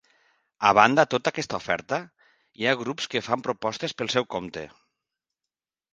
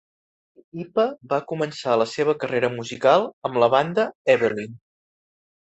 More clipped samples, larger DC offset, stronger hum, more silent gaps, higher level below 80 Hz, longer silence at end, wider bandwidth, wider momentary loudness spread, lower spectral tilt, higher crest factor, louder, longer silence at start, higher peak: neither; neither; neither; second, none vs 3.33-3.42 s, 4.15-4.25 s; about the same, -64 dBFS vs -68 dBFS; first, 1.25 s vs 1 s; first, 9.8 kHz vs 8.2 kHz; first, 14 LU vs 9 LU; second, -4 dB/octave vs -5.5 dB/octave; first, 26 dB vs 20 dB; about the same, -24 LUFS vs -22 LUFS; second, 0.6 s vs 0.75 s; first, 0 dBFS vs -4 dBFS